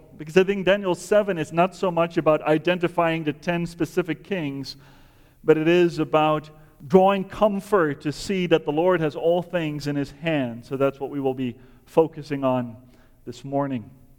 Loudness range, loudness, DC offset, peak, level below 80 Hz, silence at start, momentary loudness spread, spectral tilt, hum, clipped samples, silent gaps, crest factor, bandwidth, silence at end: 5 LU; -23 LUFS; under 0.1%; -2 dBFS; -52 dBFS; 0.15 s; 9 LU; -6.5 dB/octave; none; under 0.1%; none; 20 dB; 18 kHz; 0.3 s